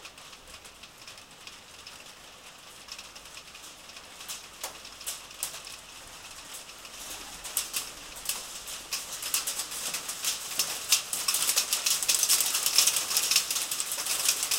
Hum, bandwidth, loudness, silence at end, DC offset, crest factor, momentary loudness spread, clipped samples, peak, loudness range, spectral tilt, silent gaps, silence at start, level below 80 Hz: none; 17 kHz; -27 LUFS; 0 s; under 0.1%; 26 dB; 23 LU; under 0.1%; -6 dBFS; 20 LU; 2 dB/octave; none; 0 s; -64 dBFS